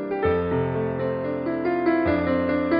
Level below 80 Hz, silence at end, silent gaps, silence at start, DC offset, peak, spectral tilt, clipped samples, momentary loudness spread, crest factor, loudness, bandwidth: -46 dBFS; 0 s; none; 0 s; under 0.1%; -10 dBFS; -6.5 dB/octave; under 0.1%; 5 LU; 12 dB; -24 LUFS; 5.2 kHz